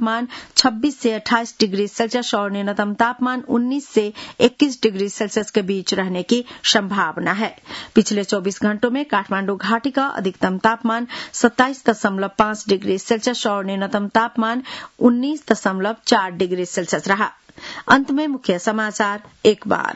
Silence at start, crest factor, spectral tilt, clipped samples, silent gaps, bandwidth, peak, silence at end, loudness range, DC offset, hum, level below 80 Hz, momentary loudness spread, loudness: 0 s; 20 dB; -4 dB/octave; under 0.1%; none; 8 kHz; 0 dBFS; 0 s; 1 LU; under 0.1%; none; -58 dBFS; 6 LU; -19 LUFS